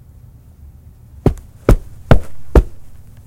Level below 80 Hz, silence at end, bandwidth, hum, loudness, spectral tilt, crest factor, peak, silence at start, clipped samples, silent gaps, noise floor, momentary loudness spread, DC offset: -20 dBFS; 0.25 s; 16 kHz; none; -17 LUFS; -8 dB/octave; 16 dB; 0 dBFS; 1.25 s; 0.1%; none; -41 dBFS; 4 LU; under 0.1%